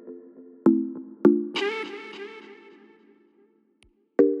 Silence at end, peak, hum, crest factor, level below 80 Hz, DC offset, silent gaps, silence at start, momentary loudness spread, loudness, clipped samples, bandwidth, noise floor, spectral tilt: 0 s; -4 dBFS; none; 22 dB; -74 dBFS; under 0.1%; none; 0.05 s; 23 LU; -24 LUFS; under 0.1%; 8.2 kHz; -63 dBFS; -6.5 dB/octave